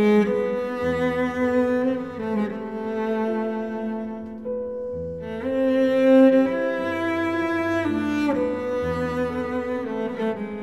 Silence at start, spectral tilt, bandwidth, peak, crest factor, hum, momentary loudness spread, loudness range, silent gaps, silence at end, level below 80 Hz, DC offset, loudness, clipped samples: 0 s; -7 dB/octave; 12 kHz; -6 dBFS; 16 dB; none; 11 LU; 7 LU; none; 0 s; -52 dBFS; 0.2%; -23 LUFS; under 0.1%